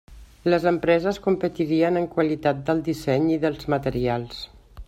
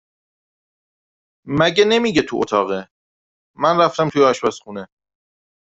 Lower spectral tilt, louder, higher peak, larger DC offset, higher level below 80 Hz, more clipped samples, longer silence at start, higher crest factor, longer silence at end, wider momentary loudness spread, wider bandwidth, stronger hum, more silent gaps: first, -7 dB/octave vs -5 dB/octave; second, -23 LUFS vs -17 LUFS; second, -6 dBFS vs -2 dBFS; neither; first, -48 dBFS vs -56 dBFS; neither; second, 0.1 s vs 1.45 s; about the same, 18 dB vs 18 dB; second, 0.05 s vs 0.85 s; second, 7 LU vs 13 LU; first, 13.5 kHz vs 8 kHz; neither; second, none vs 2.91-3.54 s